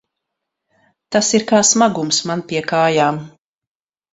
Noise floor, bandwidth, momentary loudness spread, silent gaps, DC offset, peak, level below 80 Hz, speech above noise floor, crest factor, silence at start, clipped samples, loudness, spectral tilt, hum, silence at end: -79 dBFS; 8.4 kHz; 9 LU; none; under 0.1%; 0 dBFS; -60 dBFS; 63 dB; 18 dB; 1.1 s; under 0.1%; -15 LUFS; -3 dB/octave; none; 0.85 s